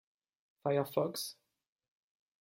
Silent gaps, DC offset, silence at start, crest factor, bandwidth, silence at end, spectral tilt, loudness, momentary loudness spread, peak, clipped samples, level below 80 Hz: none; under 0.1%; 0.65 s; 22 dB; 16.5 kHz; 1.1 s; -5 dB/octave; -36 LUFS; 9 LU; -16 dBFS; under 0.1%; -82 dBFS